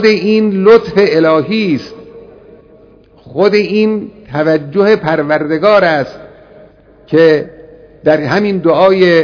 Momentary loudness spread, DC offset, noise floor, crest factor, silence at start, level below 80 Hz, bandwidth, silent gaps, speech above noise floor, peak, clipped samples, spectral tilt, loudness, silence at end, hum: 10 LU; under 0.1%; -42 dBFS; 12 dB; 0 s; -48 dBFS; 5.4 kHz; none; 32 dB; 0 dBFS; 0.8%; -7 dB/octave; -11 LUFS; 0 s; none